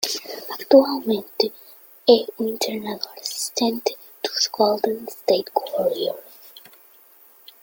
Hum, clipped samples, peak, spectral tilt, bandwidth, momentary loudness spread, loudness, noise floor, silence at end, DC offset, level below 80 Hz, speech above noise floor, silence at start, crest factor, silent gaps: none; under 0.1%; -2 dBFS; -3 dB/octave; 17 kHz; 15 LU; -22 LUFS; -51 dBFS; 1.05 s; under 0.1%; -68 dBFS; 31 dB; 0 s; 22 dB; none